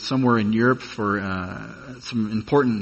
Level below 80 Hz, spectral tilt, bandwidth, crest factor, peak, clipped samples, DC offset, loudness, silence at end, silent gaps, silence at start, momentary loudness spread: -54 dBFS; -7 dB/octave; 8.4 kHz; 18 dB; -4 dBFS; under 0.1%; under 0.1%; -22 LUFS; 0 s; none; 0 s; 15 LU